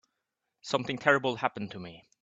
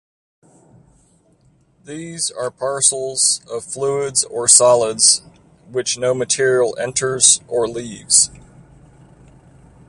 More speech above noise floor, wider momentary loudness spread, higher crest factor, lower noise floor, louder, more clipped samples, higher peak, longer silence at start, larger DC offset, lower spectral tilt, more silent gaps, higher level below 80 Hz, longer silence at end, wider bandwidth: first, 54 dB vs 39 dB; first, 20 LU vs 13 LU; first, 26 dB vs 20 dB; first, -84 dBFS vs -56 dBFS; second, -29 LUFS vs -15 LUFS; neither; second, -6 dBFS vs 0 dBFS; second, 0.65 s vs 1.9 s; neither; first, -5 dB/octave vs -1.5 dB/octave; neither; second, -70 dBFS vs -56 dBFS; second, 0.2 s vs 1.5 s; second, 8.2 kHz vs 16 kHz